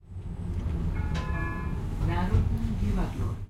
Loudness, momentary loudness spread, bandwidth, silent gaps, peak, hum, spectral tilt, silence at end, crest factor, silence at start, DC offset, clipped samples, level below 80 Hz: -31 LUFS; 7 LU; 12 kHz; none; -12 dBFS; none; -8 dB/octave; 0 s; 16 dB; 0.05 s; under 0.1%; under 0.1%; -32 dBFS